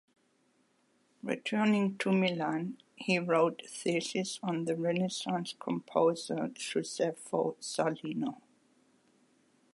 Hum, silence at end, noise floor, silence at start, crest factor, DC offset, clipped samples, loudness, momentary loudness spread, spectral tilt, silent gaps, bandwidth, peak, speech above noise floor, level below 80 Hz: none; 1.4 s; -72 dBFS; 1.25 s; 20 dB; under 0.1%; under 0.1%; -33 LUFS; 8 LU; -5 dB/octave; none; 11.5 kHz; -14 dBFS; 40 dB; -82 dBFS